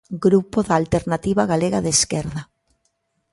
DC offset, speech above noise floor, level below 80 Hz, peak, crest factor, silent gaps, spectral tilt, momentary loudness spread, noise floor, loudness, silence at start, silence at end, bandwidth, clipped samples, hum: under 0.1%; 51 dB; -44 dBFS; -4 dBFS; 16 dB; none; -4.5 dB/octave; 7 LU; -70 dBFS; -19 LUFS; 0.1 s; 0.9 s; 11.5 kHz; under 0.1%; none